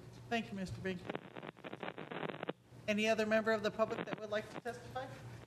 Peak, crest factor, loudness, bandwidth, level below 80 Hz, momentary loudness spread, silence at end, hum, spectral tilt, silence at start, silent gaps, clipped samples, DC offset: -20 dBFS; 18 dB; -39 LUFS; 13.5 kHz; -68 dBFS; 13 LU; 0 s; none; -5 dB/octave; 0 s; none; under 0.1%; under 0.1%